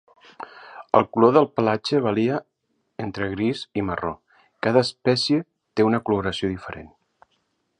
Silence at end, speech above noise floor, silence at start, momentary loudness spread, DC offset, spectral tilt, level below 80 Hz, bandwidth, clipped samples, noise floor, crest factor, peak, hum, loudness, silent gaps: 0.95 s; 49 dB; 0.4 s; 22 LU; under 0.1%; -6 dB/octave; -54 dBFS; 10.5 kHz; under 0.1%; -71 dBFS; 22 dB; -2 dBFS; none; -22 LUFS; none